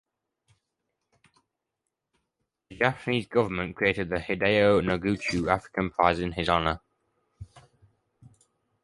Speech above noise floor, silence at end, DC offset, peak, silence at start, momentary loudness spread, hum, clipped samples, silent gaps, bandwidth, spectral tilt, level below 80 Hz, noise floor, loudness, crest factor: 58 dB; 1.25 s; under 0.1%; -6 dBFS; 2.7 s; 8 LU; none; under 0.1%; none; 11.5 kHz; -6 dB/octave; -50 dBFS; -84 dBFS; -26 LUFS; 24 dB